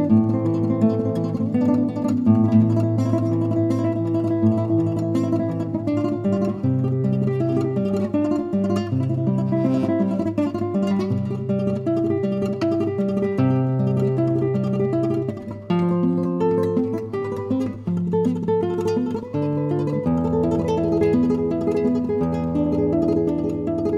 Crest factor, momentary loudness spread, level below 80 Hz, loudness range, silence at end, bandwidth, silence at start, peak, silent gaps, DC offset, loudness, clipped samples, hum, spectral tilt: 16 dB; 4 LU; -50 dBFS; 3 LU; 0 s; 10 kHz; 0 s; -6 dBFS; none; under 0.1%; -21 LUFS; under 0.1%; none; -9.5 dB/octave